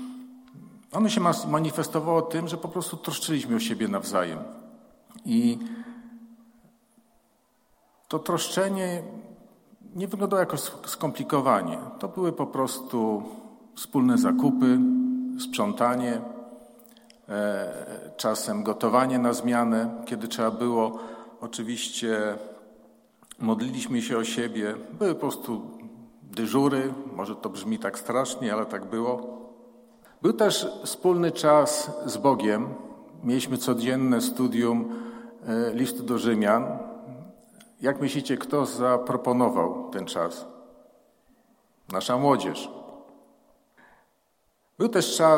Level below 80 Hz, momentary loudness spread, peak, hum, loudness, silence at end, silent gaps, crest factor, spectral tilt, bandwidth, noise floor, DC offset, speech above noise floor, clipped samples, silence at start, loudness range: -72 dBFS; 17 LU; -6 dBFS; none; -26 LUFS; 0 s; none; 20 dB; -5 dB/octave; 16.5 kHz; -70 dBFS; under 0.1%; 44 dB; under 0.1%; 0 s; 6 LU